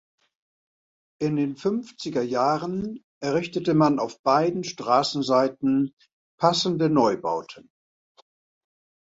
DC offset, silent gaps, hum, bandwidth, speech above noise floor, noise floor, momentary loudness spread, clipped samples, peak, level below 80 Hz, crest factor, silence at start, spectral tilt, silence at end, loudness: under 0.1%; 3.04-3.21 s, 4.19-4.24 s, 5.93-5.97 s, 6.13-6.38 s; none; 8 kHz; over 67 dB; under -90 dBFS; 10 LU; under 0.1%; -4 dBFS; -66 dBFS; 20 dB; 1.2 s; -6 dB/octave; 1.55 s; -24 LUFS